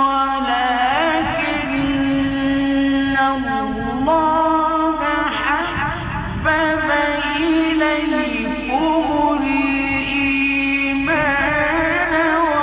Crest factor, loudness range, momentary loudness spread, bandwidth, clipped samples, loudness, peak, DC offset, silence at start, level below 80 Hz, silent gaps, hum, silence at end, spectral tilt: 12 dB; 1 LU; 5 LU; 4 kHz; under 0.1%; -17 LUFS; -4 dBFS; under 0.1%; 0 s; -38 dBFS; none; none; 0 s; -9 dB/octave